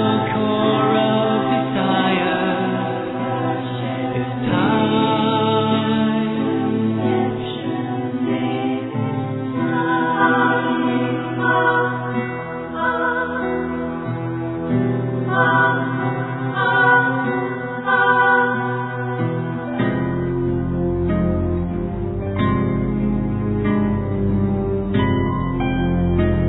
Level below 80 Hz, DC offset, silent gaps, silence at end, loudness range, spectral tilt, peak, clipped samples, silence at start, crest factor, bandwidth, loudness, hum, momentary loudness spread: -38 dBFS; under 0.1%; none; 0 s; 4 LU; -10.5 dB/octave; -2 dBFS; under 0.1%; 0 s; 16 dB; 4.1 kHz; -19 LUFS; none; 8 LU